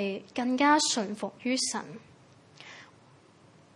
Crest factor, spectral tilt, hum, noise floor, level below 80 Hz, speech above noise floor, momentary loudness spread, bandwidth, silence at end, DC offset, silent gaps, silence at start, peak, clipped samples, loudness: 20 dB; -2.5 dB/octave; none; -58 dBFS; -78 dBFS; 29 dB; 26 LU; 11.5 kHz; 0.9 s; under 0.1%; none; 0 s; -12 dBFS; under 0.1%; -28 LUFS